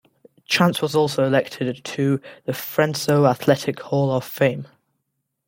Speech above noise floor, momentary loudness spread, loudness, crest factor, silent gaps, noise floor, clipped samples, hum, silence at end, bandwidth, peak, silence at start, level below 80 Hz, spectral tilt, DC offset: 56 dB; 9 LU; -21 LUFS; 20 dB; none; -76 dBFS; under 0.1%; none; 0.85 s; 17 kHz; -2 dBFS; 0.5 s; -64 dBFS; -5.5 dB/octave; under 0.1%